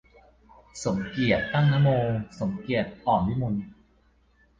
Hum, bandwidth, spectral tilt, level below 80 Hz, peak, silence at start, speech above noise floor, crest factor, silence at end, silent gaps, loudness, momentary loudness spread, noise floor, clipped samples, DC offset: none; 9 kHz; -7 dB/octave; -50 dBFS; -10 dBFS; 0.75 s; 38 dB; 18 dB; 0.85 s; none; -26 LUFS; 11 LU; -62 dBFS; under 0.1%; under 0.1%